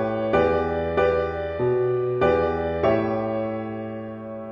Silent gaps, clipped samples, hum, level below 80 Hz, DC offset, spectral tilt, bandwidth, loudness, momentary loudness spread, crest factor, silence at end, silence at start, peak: none; under 0.1%; none; -48 dBFS; under 0.1%; -9 dB/octave; 7 kHz; -23 LUFS; 11 LU; 16 dB; 0 s; 0 s; -8 dBFS